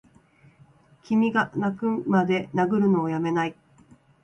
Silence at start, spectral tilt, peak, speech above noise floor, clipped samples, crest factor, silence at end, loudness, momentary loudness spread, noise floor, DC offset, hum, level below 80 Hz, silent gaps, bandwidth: 1.1 s; -8 dB/octave; -10 dBFS; 33 dB; under 0.1%; 16 dB; 0.7 s; -24 LUFS; 5 LU; -57 dBFS; under 0.1%; none; -64 dBFS; none; 8.2 kHz